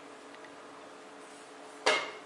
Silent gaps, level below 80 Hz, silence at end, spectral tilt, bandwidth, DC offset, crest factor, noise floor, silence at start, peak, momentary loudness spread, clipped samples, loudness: none; under -90 dBFS; 0 s; -0.5 dB/octave; 11.5 kHz; under 0.1%; 26 dB; -50 dBFS; 0 s; -12 dBFS; 20 LU; under 0.1%; -30 LUFS